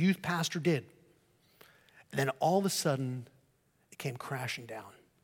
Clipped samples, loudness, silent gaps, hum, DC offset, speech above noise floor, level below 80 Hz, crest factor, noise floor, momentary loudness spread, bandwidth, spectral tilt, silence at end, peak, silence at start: under 0.1%; -33 LUFS; none; none; under 0.1%; 39 dB; -76 dBFS; 18 dB; -71 dBFS; 12 LU; 17 kHz; -5 dB/octave; 0.35 s; -16 dBFS; 0 s